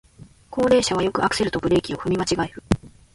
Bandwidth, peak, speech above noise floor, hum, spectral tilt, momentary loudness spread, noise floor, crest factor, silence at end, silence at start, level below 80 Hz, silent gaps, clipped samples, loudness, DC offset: 11.5 kHz; -4 dBFS; 23 dB; none; -5 dB/octave; 8 LU; -44 dBFS; 18 dB; 0.25 s; 0.2 s; -42 dBFS; none; under 0.1%; -22 LUFS; under 0.1%